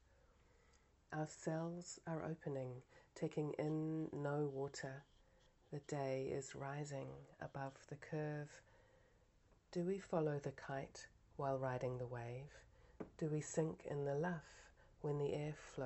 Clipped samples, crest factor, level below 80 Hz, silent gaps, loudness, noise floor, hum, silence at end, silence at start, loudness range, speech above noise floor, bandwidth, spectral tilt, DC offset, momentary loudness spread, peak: under 0.1%; 20 dB; -72 dBFS; none; -46 LUFS; -73 dBFS; none; 0 s; 1.1 s; 4 LU; 28 dB; 8.2 kHz; -6.5 dB/octave; under 0.1%; 14 LU; -26 dBFS